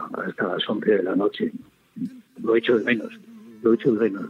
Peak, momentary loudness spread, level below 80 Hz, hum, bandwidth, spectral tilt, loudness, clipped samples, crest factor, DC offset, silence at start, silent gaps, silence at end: -8 dBFS; 14 LU; -74 dBFS; none; 6.8 kHz; -7.5 dB/octave; -23 LUFS; under 0.1%; 16 dB; under 0.1%; 0 s; none; 0 s